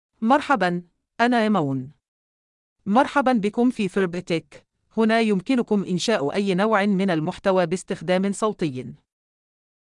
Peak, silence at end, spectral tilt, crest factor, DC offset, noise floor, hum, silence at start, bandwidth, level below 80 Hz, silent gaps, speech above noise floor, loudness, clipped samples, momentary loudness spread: -6 dBFS; 0.85 s; -6 dB/octave; 16 dB; under 0.1%; under -90 dBFS; none; 0.2 s; 11 kHz; -60 dBFS; 2.08-2.76 s; over 69 dB; -22 LUFS; under 0.1%; 9 LU